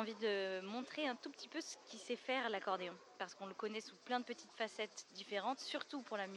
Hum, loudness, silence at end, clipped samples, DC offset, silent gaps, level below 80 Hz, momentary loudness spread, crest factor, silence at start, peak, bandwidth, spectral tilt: none; -44 LUFS; 0 s; under 0.1%; under 0.1%; none; under -90 dBFS; 10 LU; 18 dB; 0 s; -26 dBFS; 12 kHz; -3 dB/octave